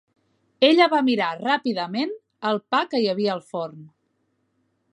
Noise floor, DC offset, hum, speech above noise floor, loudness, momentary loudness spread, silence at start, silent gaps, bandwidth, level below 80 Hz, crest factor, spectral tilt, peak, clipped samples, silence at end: -71 dBFS; under 0.1%; none; 49 dB; -22 LUFS; 13 LU; 0.6 s; none; 11 kHz; -78 dBFS; 22 dB; -5.5 dB/octave; -2 dBFS; under 0.1%; 1.05 s